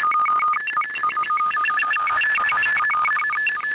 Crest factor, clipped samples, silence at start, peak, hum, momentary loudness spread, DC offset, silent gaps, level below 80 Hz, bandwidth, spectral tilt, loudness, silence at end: 8 dB; under 0.1%; 0 s; -14 dBFS; none; 4 LU; under 0.1%; none; -62 dBFS; 4 kHz; -4 dB/octave; -19 LUFS; 0 s